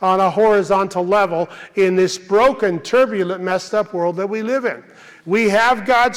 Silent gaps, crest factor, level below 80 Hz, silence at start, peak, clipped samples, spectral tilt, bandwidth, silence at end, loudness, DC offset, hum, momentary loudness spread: none; 12 dB; -52 dBFS; 0 s; -6 dBFS; under 0.1%; -5 dB/octave; 14.5 kHz; 0 s; -17 LUFS; under 0.1%; none; 8 LU